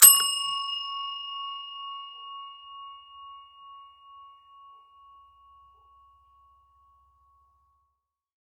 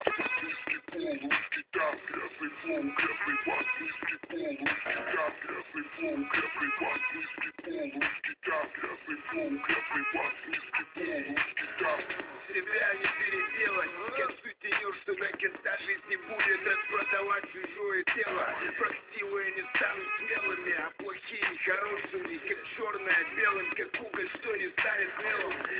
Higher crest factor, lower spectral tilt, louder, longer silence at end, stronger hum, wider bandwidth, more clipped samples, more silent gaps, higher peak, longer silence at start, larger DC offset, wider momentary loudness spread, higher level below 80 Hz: first, 30 dB vs 24 dB; second, 4 dB/octave vs -0.5 dB/octave; first, -25 LUFS vs -32 LUFS; first, 4.8 s vs 0 s; neither; first, 15.5 kHz vs 4 kHz; neither; neither; first, 0 dBFS vs -10 dBFS; about the same, 0 s vs 0 s; neither; first, 23 LU vs 8 LU; about the same, -74 dBFS vs -70 dBFS